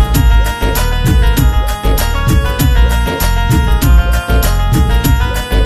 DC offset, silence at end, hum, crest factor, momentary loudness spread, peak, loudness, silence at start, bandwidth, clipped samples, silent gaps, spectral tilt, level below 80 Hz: under 0.1%; 0 s; none; 10 dB; 4 LU; 0 dBFS; -13 LUFS; 0 s; 15.5 kHz; under 0.1%; none; -5 dB/octave; -12 dBFS